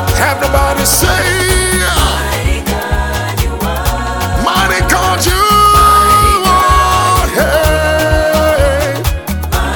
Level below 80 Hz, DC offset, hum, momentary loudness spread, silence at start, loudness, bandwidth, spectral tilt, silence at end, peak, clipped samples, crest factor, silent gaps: -18 dBFS; 0.3%; none; 9 LU; 0 s; -11 LUFS; 19 kHz; -3.5 dB/octave; 0 s; 0 dBFS; under 0.1%; 10 dB; none